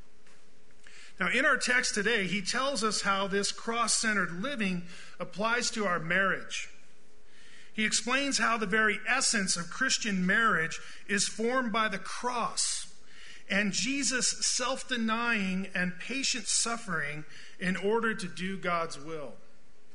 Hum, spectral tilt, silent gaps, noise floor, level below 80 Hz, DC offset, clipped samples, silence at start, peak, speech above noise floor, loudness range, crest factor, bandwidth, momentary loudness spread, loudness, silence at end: none; -2.5 dB/octave; none; -63 dBFS; -62 dBFS; 1%; under 0.1%; 0.95 s; -12 dBFS; 33 dB; 4 LU; 18 dB; 11 kHz; 11 LU; -29 LUFS; 0.6 s